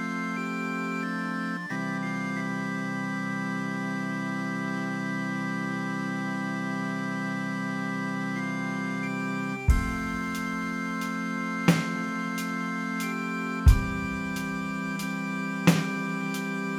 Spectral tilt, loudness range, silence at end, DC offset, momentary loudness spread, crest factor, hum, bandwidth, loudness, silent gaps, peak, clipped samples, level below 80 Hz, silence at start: -6 dB/octave; 3 LU; 0 s; under 0.1%; 6 LU; 24 dB; none; 17 kHz; -29 LUFS; none; -6 dBFS; under 0.1%; -36 dBFS; 0 s